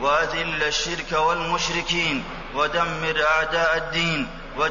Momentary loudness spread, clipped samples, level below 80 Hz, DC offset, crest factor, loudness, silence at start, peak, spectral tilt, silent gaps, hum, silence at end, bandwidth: 6 LU; under 0.1%; -40 dBFS; under 0.1%; 14 dB; -22 LUFS; 0 s; -10 dBFS; -3 dB/octave; none; none; 0 s; 7.4 kHz